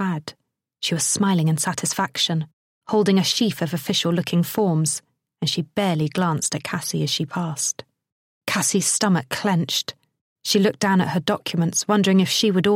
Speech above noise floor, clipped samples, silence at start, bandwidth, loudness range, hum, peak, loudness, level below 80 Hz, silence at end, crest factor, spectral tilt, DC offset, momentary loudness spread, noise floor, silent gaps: 46 dB; under 0.1%; 0 s; 16.5 kHz; 2 LU; none; -4 dBFS; -21 LUFS; -64 dBFS; 0 s; 18 dB; -4 dB/octave; under 0.1%; 8 LU; -67 dBFS; 2.53-2.81 s, 8.12-8.41 s, 10.21-10.36 s